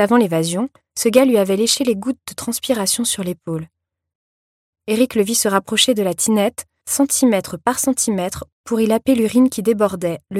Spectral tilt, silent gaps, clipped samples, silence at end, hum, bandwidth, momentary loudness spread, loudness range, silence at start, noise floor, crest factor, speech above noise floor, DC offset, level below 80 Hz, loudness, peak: -3.5 dB/octave; 4.15-4.73 s, 8.52-8.64 s; under 0.1%; 0 s; none; 16.5 kHz; 10 LU; 4 LU; 0 s; under -90 dBFS; 18 dB; over 73 dB; under 0.1%; -54 dBFS; -17 LUFS; 0 dBFS